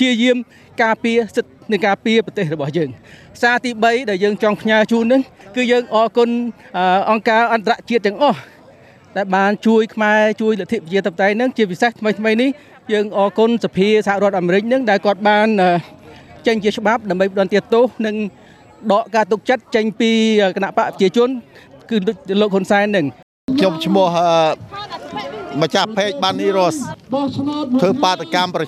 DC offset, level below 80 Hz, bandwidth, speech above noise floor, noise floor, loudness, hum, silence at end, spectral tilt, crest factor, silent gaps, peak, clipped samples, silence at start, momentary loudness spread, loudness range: under 0.1%; -60 dBFS; 13.5 kHz; 28 dB; -45 dBFS; -16 LUFS; none; 0 s; -5.5 dB/octave; 14 dB; 23.23-23.48 s; -2 dBFS; under 0.1%; 0 s; 8 LU; 2 LU